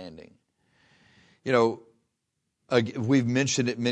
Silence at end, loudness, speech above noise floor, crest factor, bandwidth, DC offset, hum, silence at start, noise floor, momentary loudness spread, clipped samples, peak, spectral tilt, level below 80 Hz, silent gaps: 0 s; -25 LUFS; 56 dB; 22 dB; 10 kHz; under 0.1%; none; 0 s; -80 dBFS; 15 LU; under 0.1%; -6 dBFS; -5 dB/octave; -70 dBFS; none